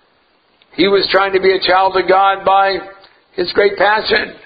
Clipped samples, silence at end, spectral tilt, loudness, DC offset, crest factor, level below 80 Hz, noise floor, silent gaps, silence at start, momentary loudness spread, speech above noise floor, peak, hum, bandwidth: under 0.1%; 0.1 s; -7 dB/octave; -13 LUFS; under 0.1%; 14 dB; -48 dBFS; -56 dBFS; none; 0.8 s; 9 LU; 43 dB; 0 dBFS; none; 5 kHz